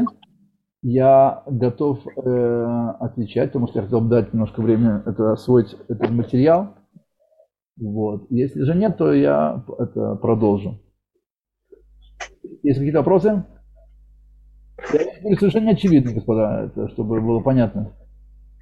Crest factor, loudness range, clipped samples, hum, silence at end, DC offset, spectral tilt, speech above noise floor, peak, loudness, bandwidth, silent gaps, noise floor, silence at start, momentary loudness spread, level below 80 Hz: 16 dB; 4 LU; under 0.1%; none; 0.7 s; under 0.1%; -9.5 dB/octave; 60 dB; -4 dBFS; -19 LUFS; 7.4 kHz; none; -79 dBFS; 0 s; 11 LU; -48 dBFS